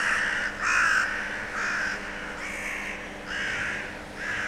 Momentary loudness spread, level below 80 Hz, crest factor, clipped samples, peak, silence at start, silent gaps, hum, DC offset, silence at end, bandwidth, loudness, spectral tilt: 11 LU; -50 dBFS; 18 dB; under 0.1%; -12 dBFS; 0 s; none; none; under 0.1%; 0 s; 16 kHz; -28 LUFS; -2 dB/octave